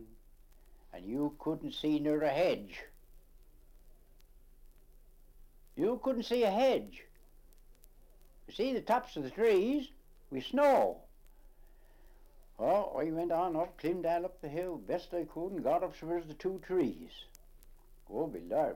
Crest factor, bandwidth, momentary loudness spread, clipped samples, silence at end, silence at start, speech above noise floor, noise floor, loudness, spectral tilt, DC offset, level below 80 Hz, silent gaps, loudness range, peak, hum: 18 dB; 16.5 kHz; 19 LU; under 0.1%; 0 s; 0 s; 26 dB; -59 dBFS; -34 LUFS; -6 dB/octave; under 0.1%; -58 dBFS; none; 5 LU; -18 dBFS; none